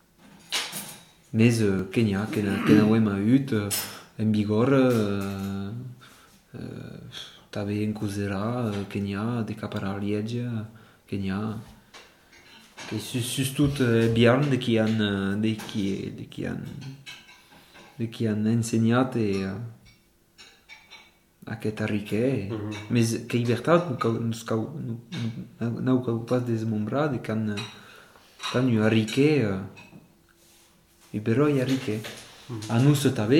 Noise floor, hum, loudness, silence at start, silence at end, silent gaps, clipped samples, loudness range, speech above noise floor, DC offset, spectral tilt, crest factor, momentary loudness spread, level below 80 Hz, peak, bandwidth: -60 dBFS; none; -26 LUFS; 0.5 s; 0 s; none; under 0.1%; 9 LU; 35 dB; under 0.1%; -6 dB/octave; 20 dB; 18 LU; -60 dBFS; -6 dBFS; 17.5 kHz